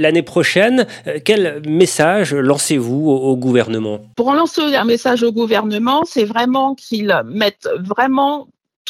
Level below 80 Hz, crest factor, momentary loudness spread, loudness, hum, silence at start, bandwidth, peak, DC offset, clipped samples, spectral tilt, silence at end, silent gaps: -64 dBFS; 16 dB; 7 LU; -15 LUFS; none; 0 s; 16 kHz; 0 dBFS; under 0.1%; under 0.1%; -4.5 dB/octave; 0 s; 8.76-8.85 s